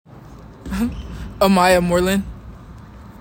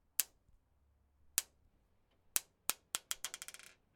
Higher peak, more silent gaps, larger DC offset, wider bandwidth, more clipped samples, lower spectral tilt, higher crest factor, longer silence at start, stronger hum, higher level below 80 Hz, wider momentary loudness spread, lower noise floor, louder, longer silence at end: first, -2 dBFS vs -6 dBFS; neither; neither; second, 16.5 kHz vs 19 kHz; neither; first, -5.5 dB/octave vs 2 dB/octave; second, 18 dB vs 40 dB; about the same, 0.15 s vs 0.2 s; neither; first, -36 dBFS vs -76 dBFS; first, 25 LU vs 12 LU; second, -40 dBFS vs -74 dBFS; first, -18 LUFS vs -40 LUFS; second, 0.1 s vs 0.45 s